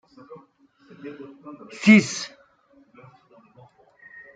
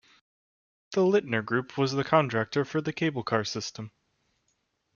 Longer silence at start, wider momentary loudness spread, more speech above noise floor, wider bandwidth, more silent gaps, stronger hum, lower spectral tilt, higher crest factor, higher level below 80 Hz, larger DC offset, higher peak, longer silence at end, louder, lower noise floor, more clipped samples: first, 1.05 s vs 0.9 s; first, 27 LU vs 10 LU; second, 38 dB vs 48 dB; first, 9.2 kHz vs 7.2 kHz; neither; neither; about the same, -5 dB/octave vs -5.5 dB/octave; about the same, 22 dB vs 22 dB; about the same, -70 dBFS vs -68 dBFS; neither; first, -4 dBFS vs -8 dBFS; first, 2.1 s vs 1.05 s; first, -18 LUFS vs -28 LUFS; second, -58 dBFS vs -76 dBFS; neither